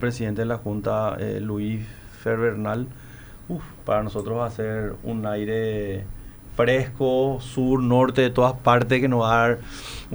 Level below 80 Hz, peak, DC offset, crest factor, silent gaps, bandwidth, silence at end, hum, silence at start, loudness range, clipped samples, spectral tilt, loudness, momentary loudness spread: -44 dBFS; -4 dBFS; under 0.1%; 20 dB; none; over 20 kHz; 0 s; none; 0 s; 7 LU; under 0.1%; -7 dB/octave; -23 LUFS; 15 LU